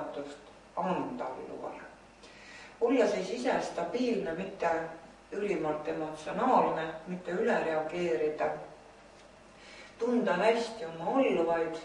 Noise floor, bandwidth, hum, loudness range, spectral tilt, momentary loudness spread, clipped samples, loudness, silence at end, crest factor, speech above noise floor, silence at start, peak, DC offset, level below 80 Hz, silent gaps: -55 dBFS; 11 kHz; none; 3 LU; -5.5 dB/octave; 21 LU; under 0.1%; -32 LUFS; 0 s; 20 dB; 24 dB; 0 s; -14 dBFS; under 0.1%; -66 dBFS; none